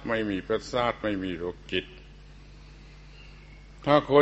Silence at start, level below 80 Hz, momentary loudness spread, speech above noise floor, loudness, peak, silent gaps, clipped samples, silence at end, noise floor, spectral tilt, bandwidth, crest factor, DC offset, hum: 0 s; -50 dBFS; 26 LU; 22 dB; -28 LUFS; -6 dBFS; none; under 0.1%; 0 s; -48 dBFS; -6 dB/octave; 8.4 kHz; 22 dB; under 0.1%; none